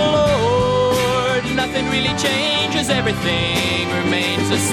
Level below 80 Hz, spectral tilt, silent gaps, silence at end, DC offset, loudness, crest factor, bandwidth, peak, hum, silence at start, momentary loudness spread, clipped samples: -38 dBFS; -4 dB/octave; none; 0 s; under 0.1%; -17 LUFS; 12 dB; 15.5 kHz; -4 dBFS; none; 0 s; 3 LU; under 0.1%